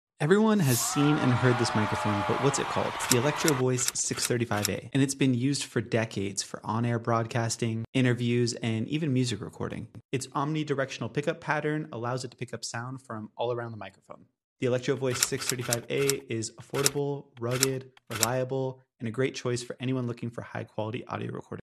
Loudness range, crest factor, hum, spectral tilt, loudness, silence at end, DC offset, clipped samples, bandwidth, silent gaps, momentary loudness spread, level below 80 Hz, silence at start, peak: 7 LU; 28 dB; none; -4.5 dB/octave; -29 LUFS; 0.05 s; under 0.1%; under 0.1%; 13.5 kHz; 7.88-7.93 s, 10.05-10.09 s, 14.44-14.56 s; 12 LU; -64 dBFS; 0.2 s; 0 dBFS